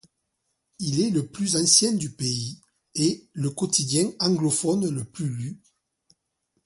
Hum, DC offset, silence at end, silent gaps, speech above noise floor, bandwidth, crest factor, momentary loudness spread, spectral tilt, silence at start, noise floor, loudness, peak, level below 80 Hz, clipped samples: none; under 0.1%; 1.1 s; none; 53 dB; 11.5 kHz; 22 dB; 14 LU; -4 dB/octave; 0.8 s; -77 dBFS; -23 LUFS; -4 dBFS; -64 dBFS; under 0.1%